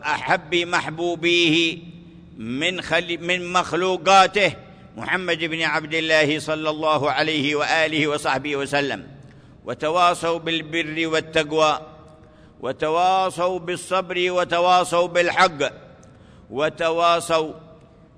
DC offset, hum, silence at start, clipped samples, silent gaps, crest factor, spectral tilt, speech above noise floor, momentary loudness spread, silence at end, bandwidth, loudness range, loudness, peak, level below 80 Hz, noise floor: under 0.1%; none; 0 s; under 0.1%; none; 18 dB; -3.5 dB/octave; 27 dB; 10 LU; 0.45 s; 11 kHz; 3 LU; -20 LUFS; -4 dBFS; -56 dBFS; -48 dBFS